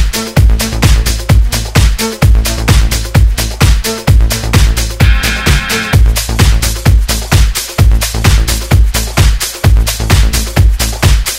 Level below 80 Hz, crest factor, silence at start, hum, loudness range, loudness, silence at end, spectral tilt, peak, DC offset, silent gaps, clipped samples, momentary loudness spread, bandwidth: -10 dBFS; 8 dB; 0 s; none; 0 LU; -11 LUFS; 0 s; -4 dB/octave; 0 dBFS; under 0.1%; none; 1%; 2 LU; 16.5 kHz